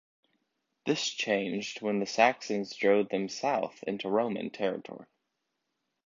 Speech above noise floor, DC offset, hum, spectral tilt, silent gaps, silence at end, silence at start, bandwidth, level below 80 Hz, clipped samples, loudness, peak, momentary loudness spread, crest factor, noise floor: 52 dB; under 0.1%; none; -4 dB/octave; none; 1.05 s; 0.85 s; 7.6 kHz; -78 dBFS; under 0.1%; -30 LUFS; -8 dBFS; 10 LU; 24 dB; -82 dBFS